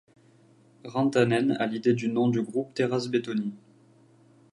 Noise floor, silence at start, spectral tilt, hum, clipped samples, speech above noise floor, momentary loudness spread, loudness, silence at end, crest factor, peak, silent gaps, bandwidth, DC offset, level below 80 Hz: -58 dBFS; 0.85 s; -6.5 dB/octave; none; under 0.1%; 33 dB; 9 LU; -27 LUFS; 0.95 s; 18 dB; -10 dBFS; none; 11 kHz; under 0.1%; -72 dBFS